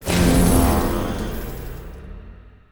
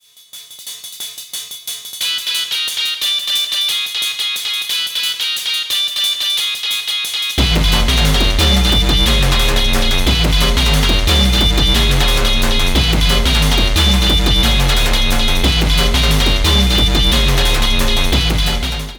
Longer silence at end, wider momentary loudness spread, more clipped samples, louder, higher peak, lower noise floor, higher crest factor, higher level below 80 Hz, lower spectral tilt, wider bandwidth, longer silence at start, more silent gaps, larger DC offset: first, 0.2 s vs 0 s; first, 23 LU vs 5 LU; neither; second, -19 LUFS vs -14 LUFS; second, -4 dBFS vs 0 dBFS; first, -42 dBFS vs -38 dBFS; about the same, 16 dB vs 14 dB; second, -26 dBFS vs -16 dBFS; first, -5.5 dB/octave vs -3.5 dB/octave; about the same, over 20 kHz vs over 20 kHz; second, 0 s vs 0.35 s; neither; neither